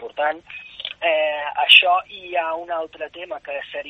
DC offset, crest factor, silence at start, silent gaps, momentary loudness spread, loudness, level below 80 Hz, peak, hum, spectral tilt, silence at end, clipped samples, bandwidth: under 0.1%; 22 dB; 0 s; none; 21 LU; -17 LUFS; -64 dBFS; 0 dBFS; none; -1 dB/octave; 0 s; under 0.1%; 8.4 kHz